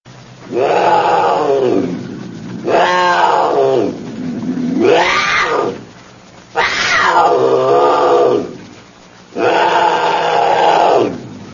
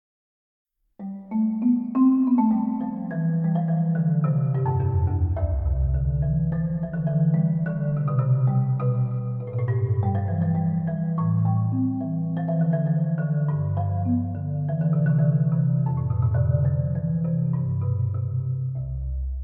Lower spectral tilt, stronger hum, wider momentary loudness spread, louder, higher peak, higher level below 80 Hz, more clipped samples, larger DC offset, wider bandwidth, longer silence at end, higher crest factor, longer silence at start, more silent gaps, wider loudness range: second, -4.5 dB/octave vs -14 dB/octave; neither; first, 13 LU vs 6 LU; first, -13 LUFS vs -24 LUFS; first, 0 dBFS vs -10 dBFS; second, -52 dBFS vs -36 dBFS; neither; first, 0.1% vs under 0.1%; first, 7.4 kHz vs 2.6 kHz; about the same, 0 s vs 0 s; about the same, 14 dB vs 12 dB; second, 0.05 s vs 1 s; neither; about the same, 2 LU vs 2 LU